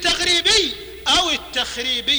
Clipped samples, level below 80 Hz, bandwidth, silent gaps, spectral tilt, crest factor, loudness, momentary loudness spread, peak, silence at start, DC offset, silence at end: under 0.1%; -42 dBFS; over 20 kHz; none; -0.5 dB/octave; 14 dB; -17 LUFS; 9 LU; -4 dBFS; 0 s; under 0.1%; 0 s